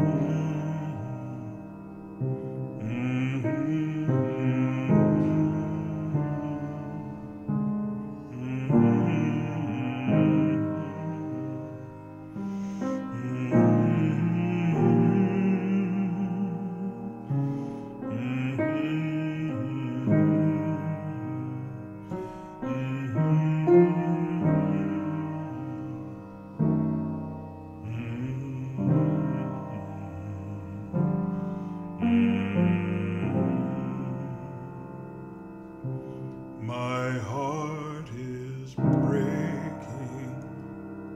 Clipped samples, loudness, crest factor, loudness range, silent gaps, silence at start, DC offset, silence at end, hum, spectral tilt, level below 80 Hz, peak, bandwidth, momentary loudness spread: under 0.1%; -28 LUFS; 20 dB; 7 LU; none; 0 s; under 0.1%; 0 s; none; -9 dB/octave; -60 dBFS; -8 dBFS; 7.8 kHz; 16 LU